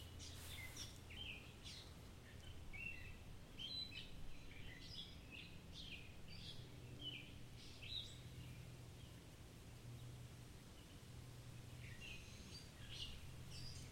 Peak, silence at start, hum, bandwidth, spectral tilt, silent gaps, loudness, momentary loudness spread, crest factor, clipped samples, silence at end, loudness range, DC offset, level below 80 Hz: -36 dBFS; 0 s; none; 16 kHz; -3.5 dB/octave; none; -55 LUFS; 9 LU; 18 dB; under 0.1%; 0 s; 5 LU; under 0.1%; -62 dBFS